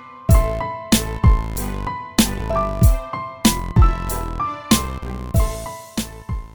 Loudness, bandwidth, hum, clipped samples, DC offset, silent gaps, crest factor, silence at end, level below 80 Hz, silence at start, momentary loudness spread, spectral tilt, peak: -20 LUFS; over 20 kHz; none; under 0.1%; 0.3%; none; 18 dB; 0.05 s; -22 dBFS; 0 s; 11 LU; -5 dB/octave; 0 dBFS